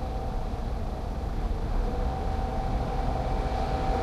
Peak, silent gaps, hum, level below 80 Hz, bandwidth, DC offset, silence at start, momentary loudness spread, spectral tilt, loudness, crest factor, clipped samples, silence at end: -14 dBFS; none; none; -30 dBFS; 11 kHz; under 0.1%; 0 s; 4 LU; -7.5 dB/octave; -32 LUFS; 14 dB; under 0.1%; 0 s